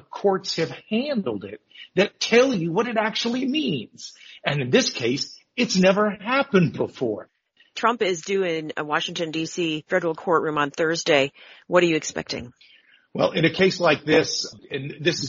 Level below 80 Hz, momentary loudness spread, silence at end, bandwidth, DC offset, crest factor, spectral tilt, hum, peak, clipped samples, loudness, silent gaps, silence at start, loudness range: -64 dBFS; 12 LU; 0 s; 7.6 kHz; under 0.1%; 20 dB; -3.5 dB/octave; none; -4 dBFS; under 0.1%; -23 LUFS; none; 0.15 s; 2 LU